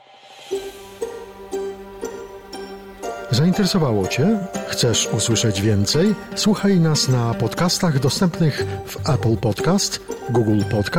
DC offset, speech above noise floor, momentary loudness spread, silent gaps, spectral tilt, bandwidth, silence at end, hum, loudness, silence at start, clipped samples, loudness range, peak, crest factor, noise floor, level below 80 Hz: under 0.1%; 25 dB; 15 LU; none; -5 dB/octave; 16.5 kHz; 0 s; none; -19 LUFS; 0.25 s; under 0.1%; 6 LU; -8 dBFS; 12 dB; -43 dBFS; -48 dBFS